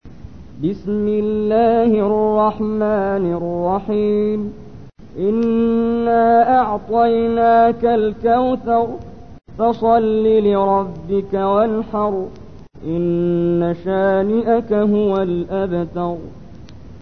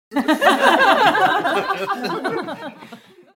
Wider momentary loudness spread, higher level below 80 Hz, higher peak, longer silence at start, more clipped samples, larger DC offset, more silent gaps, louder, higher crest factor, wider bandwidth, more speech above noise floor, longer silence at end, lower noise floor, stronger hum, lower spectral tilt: second, 10 LU vs 15 LU; first, -44 dBFS vs -60 dBFS; second, -4 dBFS vs 0 dBFS; about the same, 0 s vs 0.1 s; neither; first, 0.9% vs under 0.1%; neither; about the same, -17 LUFS vs -17 LUFS; about the same, 14 dB vs 18 dB; second, 6 kHz vs 17 kHz; about the same, 22 dB vs 25 dB; second, 0.05 s vs 0.4 s; second, -38 dBFS vs -43 dBFS; neither; first, -9.5 dB/octave vs -3.5 dB/octave